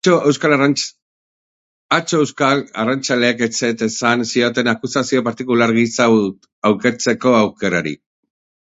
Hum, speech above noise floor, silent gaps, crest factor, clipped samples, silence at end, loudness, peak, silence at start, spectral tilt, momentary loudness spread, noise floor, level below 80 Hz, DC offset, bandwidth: none; over 74 dB; 1.02-1.89 s, 6.53-6.62 s; 16 dB; under 0.1%; 0.65 s; -16 LUFS; 0 dBFS; 0.05 s; -4.5 dB/octave; 6 LU; under -90 dBFS; -58 dBFS; under 0.1%; 8 kHz